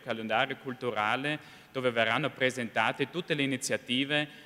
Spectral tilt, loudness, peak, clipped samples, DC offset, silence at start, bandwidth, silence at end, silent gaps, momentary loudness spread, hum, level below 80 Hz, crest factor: -4 dB/octave; -30 LUFS; -10 dBFS; under 0.1%; under 0.1%; 0 s; 16 kHz; 0 s; none; 6 LU; none; -74 dBFS; 20 dB